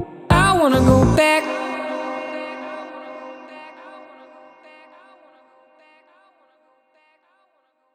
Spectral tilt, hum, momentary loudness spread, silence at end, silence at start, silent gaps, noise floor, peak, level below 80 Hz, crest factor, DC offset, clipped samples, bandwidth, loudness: -6 dB/octave; none; 25 LU; 3.9 s; 0 s; none; -65 dBFS; 0 dBFS; -36 dBFS; 22 dB; under 0.1%; under 0.1%; 16 kHz; -18 LUFS